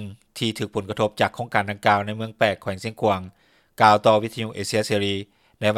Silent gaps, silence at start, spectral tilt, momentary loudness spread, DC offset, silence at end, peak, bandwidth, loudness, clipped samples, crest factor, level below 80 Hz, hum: none; 0 s; -5 dB/octave; 12 LU; under 0.1%; 0 s; 0 dBFS; 16 kHz; -22 LUFS; under 0.1%; 22 dB; -64 dBFS; none